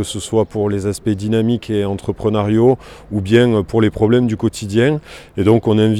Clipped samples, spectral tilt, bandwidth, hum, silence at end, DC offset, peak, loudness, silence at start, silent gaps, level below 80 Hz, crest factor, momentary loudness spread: under 0.1%; -7 dB/octave; 13 kHz; none; 0 s; under 0.1%; 0 dBFS; -16 LUFS; 0 s; none; -42 dBFS; 14 dB; 8 LU